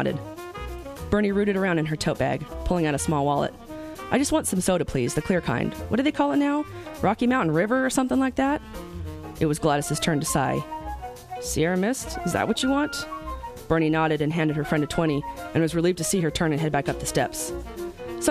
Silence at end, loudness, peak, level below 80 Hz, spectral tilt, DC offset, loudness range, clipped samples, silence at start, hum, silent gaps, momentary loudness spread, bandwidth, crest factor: 0 s; -25 LUFS; -6 dBFS; -42 dBFS; -5 dB/octave; under 0.1%; 2 LU; under 0.1%; 0 s; none; none; 13 LU; 15 kHz; 20 dB